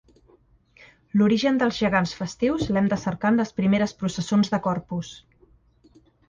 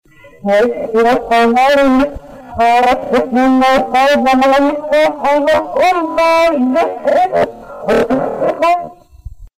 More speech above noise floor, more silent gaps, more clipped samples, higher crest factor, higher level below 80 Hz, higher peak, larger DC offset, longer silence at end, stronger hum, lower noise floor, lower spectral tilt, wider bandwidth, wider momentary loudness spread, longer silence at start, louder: first, 36 dB vs 21 dB; neither; neither; first, 16 dB vs 6 dB; second, -52 dBFS vs -40 dBFS; about the same, -8 dBFS vs -6 dBFS; neither; first, 1.1 s vs 0.1 s; neither; first, -59 dBFS vs -32 dBFS; about the same, -6 dB/octave vs -5 dB/octave; second, 7.6 kHz vs 16 kHz; about the same, 8 LU vs 7 LU; first, 1.15 s vs 0.25 s; second, -23 LUFS vs -12 LUFS